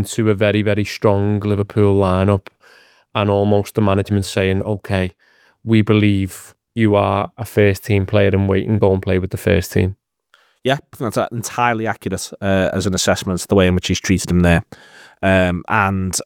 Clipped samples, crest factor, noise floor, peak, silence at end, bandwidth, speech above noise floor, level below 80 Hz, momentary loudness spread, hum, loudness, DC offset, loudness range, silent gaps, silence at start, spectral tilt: under 0.1%; 16 dB; -57 dBFS; 0 dBFS; 0 s; 17 kHz; 41 dB; -46 dBFS; 7 LU; none; -17 LUFS; under 0.1%; 3 LU; none; 0 s; -6 dB/octave